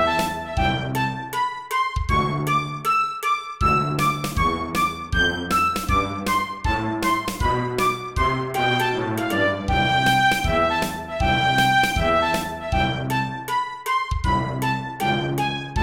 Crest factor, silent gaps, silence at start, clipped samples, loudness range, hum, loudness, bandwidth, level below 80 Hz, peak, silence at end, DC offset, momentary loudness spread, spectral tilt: 14 dB; none; 0 s; under 0.1%; 3 LU; none; -22 LUFS; 17.5 kHz; -34 dBFS; -8 dBFS; 0 s; 0.1%; 6 LU; -4.5 dB/octave